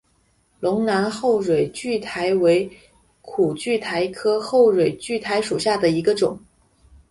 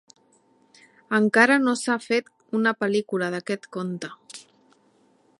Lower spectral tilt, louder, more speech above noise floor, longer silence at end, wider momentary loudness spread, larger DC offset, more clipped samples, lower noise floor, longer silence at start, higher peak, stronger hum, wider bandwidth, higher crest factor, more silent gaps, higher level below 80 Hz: about the same, -5 dB/octave vs -4.5 dB/octave; about the same, -21 LUFS vs -23 LUFS; first, 43 dB vs 39 dB; second, 0.7 s vs 1 s; second, 9 LU vs 19 LU; neither; neither; about the same, -63 dBFS vs -62 dBFS; second, 0.6 s vs 1.1 s; about the same, -6 dBFS vs -4 dBFS; neither; about the same, 11.5 kHz vs 11.5 kHz; second, 16 dB vs 22 dB; neither; first, -56 dBFS vs -78 dBFS